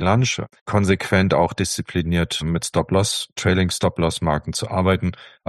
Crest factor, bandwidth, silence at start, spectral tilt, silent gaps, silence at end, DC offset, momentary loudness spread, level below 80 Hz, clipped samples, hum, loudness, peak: 18 dB; 12.5 kHz; 0 s; -5 dB/octave; 0.61-0.66 s; 0.2 s; under 0.1%; 5 LU; -40 dBFS; under 0.1%; none; -21 LUFS; -2 dBFS